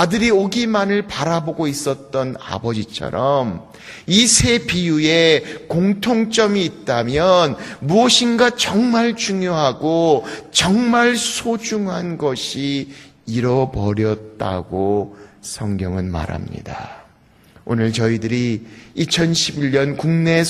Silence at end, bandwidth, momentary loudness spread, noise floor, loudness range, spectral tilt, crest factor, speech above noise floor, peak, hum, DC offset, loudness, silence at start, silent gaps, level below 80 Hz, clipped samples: 0 s; 15 kHz; 13 LU; -51 dBFS; 7 LU; -4 dB/octave; 18 dB; 33 dB; 0 dBFS; none; under 0.1%; -17 LUFS; 0 s; none; -44 dBFS; under 0.1%